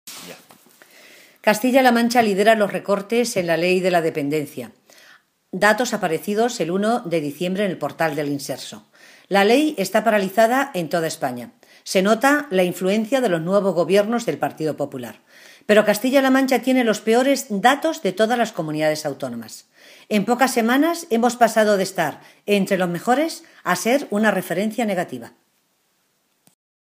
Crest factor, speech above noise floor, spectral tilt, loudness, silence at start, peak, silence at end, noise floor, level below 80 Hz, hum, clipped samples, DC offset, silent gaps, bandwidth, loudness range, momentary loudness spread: 20 dB; 47 dB; -4.5 dB/octave; -19 LUFS; 0.05 s; 0 dBFS; 1.65 s; -67 dBFS; -72 dBFS; none; under 0.1%; under 0.1%; none; 15.5 kHz; 4 LU; 13 LU